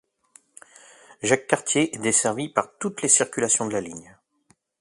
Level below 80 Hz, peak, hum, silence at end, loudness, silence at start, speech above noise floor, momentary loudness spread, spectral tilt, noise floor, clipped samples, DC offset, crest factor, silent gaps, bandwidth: -66 dBFS; -2 dBFS; none; 0.8 s; -22 LUFS; 1.2 s; 41 dB; 12 LU; -2.5 dB/octave; -64 dBFS; under 0.1%; under 0.1%; 24 dB; none; 11.5 kHz